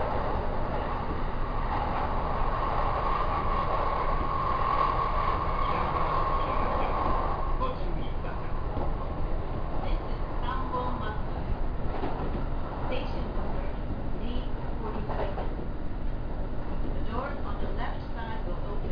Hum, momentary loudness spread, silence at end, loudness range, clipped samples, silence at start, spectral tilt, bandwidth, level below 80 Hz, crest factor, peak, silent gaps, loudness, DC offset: none; 8 LU; 0 s; 7 LU; under 0.1%; 0 s; -9 dB/octave; 5.2 kHz; -32 dBFS; 14 dB; -14 dBFS; none; -32 LUFS; under 0.1%